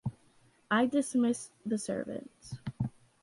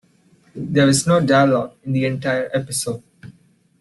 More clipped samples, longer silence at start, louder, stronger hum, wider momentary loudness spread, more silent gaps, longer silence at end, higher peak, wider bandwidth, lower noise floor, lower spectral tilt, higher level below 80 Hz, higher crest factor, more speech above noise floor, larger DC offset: neither; second, 0.05 s vs 0.55 s; second, -33 LUFS vs -18 LUFS; neither; first, 15 LU vs 11 LU; neither; second, 0.35 s vs 0.5 s; second, -18 dBFS vs -4 dBFS; about the same, 11.5 kHz vs 12.5 kHz; first, -65 dBFS vs -55 dBFS; about the same, -5.5 dB/octave vs -5 dB/octave; second, -62 dBFS vs -56 dBFS; about the same, 16 dB vs 16 dB; about the same, 34 dB vs 37 dB; neither